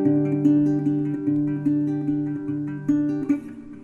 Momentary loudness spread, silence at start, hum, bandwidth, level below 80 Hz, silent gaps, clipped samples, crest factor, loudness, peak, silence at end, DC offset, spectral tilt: 8 LU; 0 s; none; 3.1 kHz; -60 dBFS; none; under 0.1%; 14 dB; -23 LUFS; -8 dBFS; 0 s; under 0.1%; -10.5 dB/octave